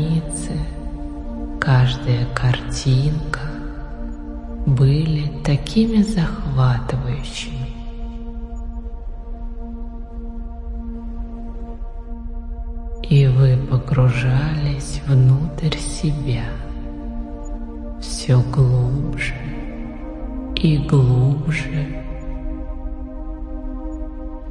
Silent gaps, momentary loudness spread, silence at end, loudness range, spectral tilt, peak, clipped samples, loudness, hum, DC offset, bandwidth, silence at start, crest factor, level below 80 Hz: none; 17 LU; 0 s; 15 LU; -7 dB/octave; -2 dBFS; under 0.1%; -20 LUFS; none; under 0.1%; 11 kHz; 0 s; 18 dB; -28 dBFS